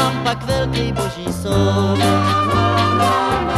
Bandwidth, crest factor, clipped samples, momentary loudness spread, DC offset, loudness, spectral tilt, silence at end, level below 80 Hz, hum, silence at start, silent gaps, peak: 13.5 kHz; 14 dB; under 0.1%; 6 LU; under 0.1%; -17 LUFS; -5.5 dB/octave; 0 s; -34 dBFS; none; 0 s; none; -2 dBFS